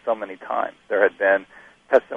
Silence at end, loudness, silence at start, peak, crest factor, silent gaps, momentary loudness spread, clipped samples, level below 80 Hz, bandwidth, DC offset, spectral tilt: 0 s; -22 LUFS; 0.05 s; -2 dBFS; 20 dB; none; 9 LU; under 0.1%; -68 dBFS; 7 kHz; under 0.1%; -5.5 dB/octave